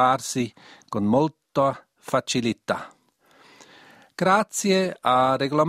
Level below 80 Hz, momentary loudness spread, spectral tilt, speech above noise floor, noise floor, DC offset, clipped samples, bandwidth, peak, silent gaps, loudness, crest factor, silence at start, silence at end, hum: -62 dBFS; 11 LU; -4.5 dB/octave; 36 dB; -58 dBFS; under 0.1%; under 0.1%; 15.5 kHz; -6 dBFS; none; -23 LUFS; 18 dB; 0 s; 0 s; none